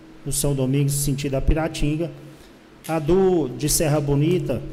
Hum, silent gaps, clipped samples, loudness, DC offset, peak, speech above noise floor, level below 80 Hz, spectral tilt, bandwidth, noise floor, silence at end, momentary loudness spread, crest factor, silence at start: none; none; under 0.1%; -22 LUFS; under 0.1%; -8 dBFS; 26 dB; -32 dBFS; -5.5 dB/octave; 16 kHz; -46 dBFS; 0 s; 9 LU; 12 dB; 0 s